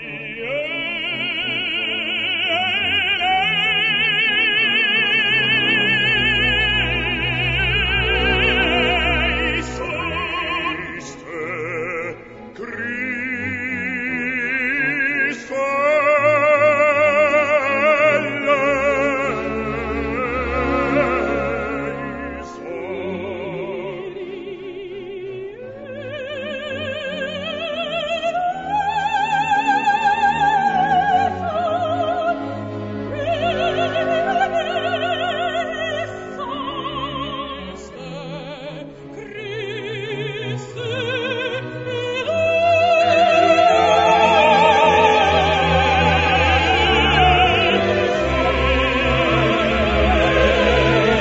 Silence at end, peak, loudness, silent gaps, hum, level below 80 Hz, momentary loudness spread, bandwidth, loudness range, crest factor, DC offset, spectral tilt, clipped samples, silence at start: 0 s; -2 dBFS; -18 LUFS; none; none; -34 dBFS; 15 LU; 7.8 kHz; 14 LU; 18 dB; under 0.1%; -5 dB/octave; under 0.1%; 0 s